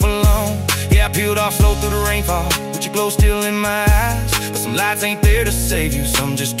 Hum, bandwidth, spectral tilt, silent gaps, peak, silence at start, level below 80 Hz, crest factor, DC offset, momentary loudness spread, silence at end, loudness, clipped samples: none; 16.5 kHz; -4 dB/octave; none; -2 dBFS; 0 s; -20 dBFS; 14 dB; under 0.1%; 4 LU; 0 s; -17 LUFS; under 0.1%